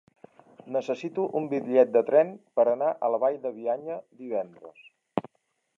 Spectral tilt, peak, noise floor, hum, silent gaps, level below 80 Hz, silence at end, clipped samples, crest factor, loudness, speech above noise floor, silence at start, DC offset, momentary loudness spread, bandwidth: -7.5 dB/octave; -8 dBFS; -75 dBFS; none; none; -80 dBFS; 0.55 s; under 0.1%; 20 dB; -27 LUFS; 49 dB; 0.65 s; under 0.1%; 13 LU; 7.2 kHz